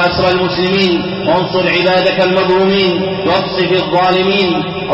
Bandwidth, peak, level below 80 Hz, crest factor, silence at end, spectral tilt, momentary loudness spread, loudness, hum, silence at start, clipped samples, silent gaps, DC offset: 7.8 kHz; -2 dBFS; -40 dBFS; 10 dB; 0 s; -7 dB/octave; 3 LU; -12 LUFS; none; 0 s; under 0.1%; none; under 0.1%